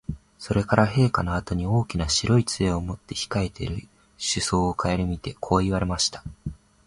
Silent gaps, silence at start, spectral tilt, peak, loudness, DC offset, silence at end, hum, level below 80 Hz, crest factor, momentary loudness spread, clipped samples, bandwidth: none; 0.1 s; -5 dB/octave; -4 dBFS; -24 LUFS; under 0.1%; 0.3 s; none; -38 dBFS; 22 dB; 14 LU; under 0.1%; 11.5 kHz